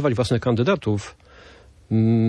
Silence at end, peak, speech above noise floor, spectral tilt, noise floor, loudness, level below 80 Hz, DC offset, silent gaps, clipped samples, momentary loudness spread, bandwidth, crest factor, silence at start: 0 s; -6 dBFS; 28 dB; -7.5 dB/octave; -48 dBFS; -22 LUFS; -50 dBFS; under 0.1%; none; under 0.1%; 8 LU; 10.5 kHz; 16 dB; 0 s